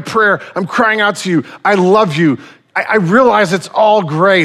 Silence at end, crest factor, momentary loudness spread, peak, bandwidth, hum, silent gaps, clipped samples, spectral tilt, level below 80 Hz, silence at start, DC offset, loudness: 0 s; 12 dB; 8 LU; 0 dBFS; 14 kHz; none; none; under 0.1%; -5.5 dB/octave; -56 dBFS; 0 s; under 0.1%; -12 LUFS